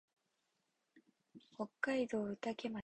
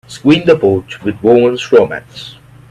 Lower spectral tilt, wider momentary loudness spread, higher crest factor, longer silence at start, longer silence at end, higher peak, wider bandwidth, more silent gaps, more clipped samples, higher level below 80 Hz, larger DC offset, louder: about the same, -5.5 dB/octave vs -6.5 dB/octave; second, 10 LU vs 19 LU; first, 20 dB vs 12 dB; first, 0.95 s vs 0.1 s; second, 0 s vs 0.4 s; second, -24 dBFS vs 0 dBFS; second, 8.8 kHz vs 11 kHz; neither; neither; second, -80 dBFS vs -48 dBFS; neither; second, -41 LUFS vs -11 LUFS